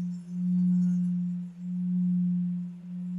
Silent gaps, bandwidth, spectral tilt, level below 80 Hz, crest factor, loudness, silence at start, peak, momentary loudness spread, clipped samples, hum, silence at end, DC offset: none; 1.5 kHz; -10.5 dB/octave; -76 dBFS; 8 dB; -29 LUFS; 0 s; -20 dBFS; 10 LU; under 0.1%; none; 0 s; under 0.1%